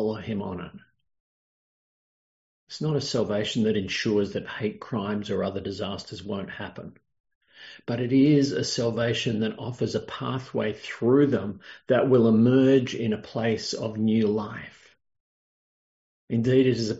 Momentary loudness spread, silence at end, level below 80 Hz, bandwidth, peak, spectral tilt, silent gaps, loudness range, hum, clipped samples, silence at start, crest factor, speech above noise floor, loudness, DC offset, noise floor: 17 LU; 0 s; -64 dBFS; 8 kHz; -8 dBFS; -6 dB/octave; 1.20-2.67 s, 7.20-7.24 s, 7.35-7.41 s, 15.20-16.28 s; 9 LU; none; under 0.1%; 0 s; 18 dB; over 65 dB; -25 LUFS; under 0.1%; under -90 dBFS